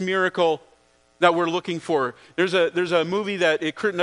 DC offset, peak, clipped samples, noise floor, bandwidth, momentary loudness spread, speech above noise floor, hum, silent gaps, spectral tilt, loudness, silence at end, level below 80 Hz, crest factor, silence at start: under 0.1%; -2 dBFS; under 0.1%; -57 dBFS; 10.5 kHz; 5 LU; 35 dB; none; none; -5 dB/octave; -22 LUFS; 0 s; -70 dBFS; 22 dB; 0 s